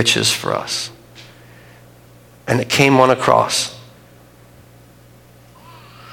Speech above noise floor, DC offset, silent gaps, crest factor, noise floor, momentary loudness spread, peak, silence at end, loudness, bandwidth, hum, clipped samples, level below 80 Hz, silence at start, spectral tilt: 30 dB; under 0.1%; none; 20 dB; -46 dBFS; 16 LU; 0 dBFS; 0 s; -15 LUFS; 17.5 kHz; 60 Hz at -45 dBFS; under 0.1%; -54 dBFS; 0 s; -3.5 dB/octave